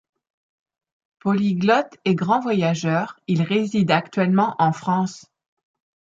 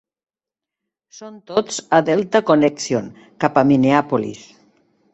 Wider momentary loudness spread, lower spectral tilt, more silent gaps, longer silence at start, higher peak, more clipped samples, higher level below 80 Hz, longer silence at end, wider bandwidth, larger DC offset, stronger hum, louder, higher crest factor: second, 5 LU vs 14 LU; about the same, -6.5 dB/octave vs -5.5 dB/octave; neither; about the same, 1.25 s vs 1.2 s; about the same, -4 dBFS vs -2 dBFS; neither; second, -66 dBFS vs -58 dBFS; first, 0.95 s vs 0.75 s; about the same, 7.8 kHz vs 8.2 kHz; neither; neither; second, -21 LUFS vs -17 LUFS; about the same, 18 dB vs 18 dB